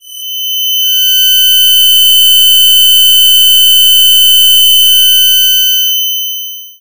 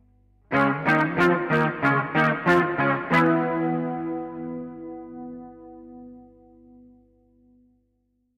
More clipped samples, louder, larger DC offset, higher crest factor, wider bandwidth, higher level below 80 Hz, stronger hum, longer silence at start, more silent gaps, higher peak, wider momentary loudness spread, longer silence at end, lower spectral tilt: first, 4% vs under 0.1%; first, -3 LUFS vs -22 LUFS; first, 5% vs under 0.1%; second, 6 dB vs 16 dB; first, over 20 kHz vs 11.5 kHz; about the same, -58 dBFS vs -60 dBFS; second, none vs 50 Hz at -60 dBFS; second, 0 s vs 0.5 s; neither; first, 0 dBFS vs -8 dBFS; second, 10 LU vs 22 LU; second, 0 s vs 2.15 s; second, 7.5 dB/octave vs -7.5 dB/octave